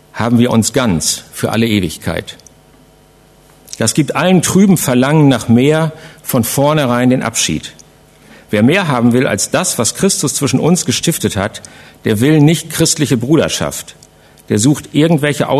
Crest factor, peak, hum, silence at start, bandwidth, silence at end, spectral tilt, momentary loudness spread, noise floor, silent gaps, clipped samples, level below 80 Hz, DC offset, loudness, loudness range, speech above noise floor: 14 dB; 0 dBFS; none; 0.15 s; 14 kHz; 0 s; -4.5 dB/octave; 11 LU; -45 dBFS; none; under 0.1%; -44 dBFS; under 0.1%; -13 LUFS; 4 LU; 33 dB